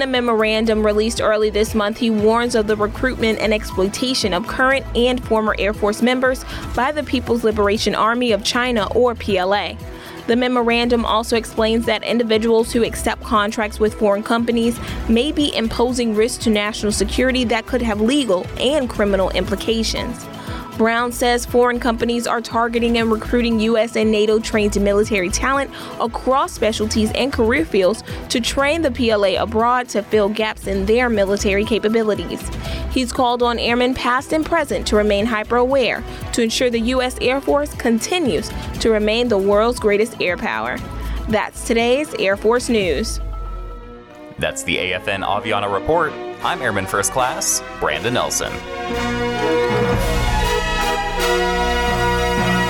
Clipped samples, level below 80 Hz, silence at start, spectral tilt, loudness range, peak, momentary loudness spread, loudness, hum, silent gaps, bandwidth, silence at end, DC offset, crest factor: under 0.1%; -32 dBFS; 0 s; -4 dB/octave; 2 LU; -4 dBFS; 6 LU; -18 LUFS; none; none; 18 kHz; 0 s; under 0.1%; 14 dB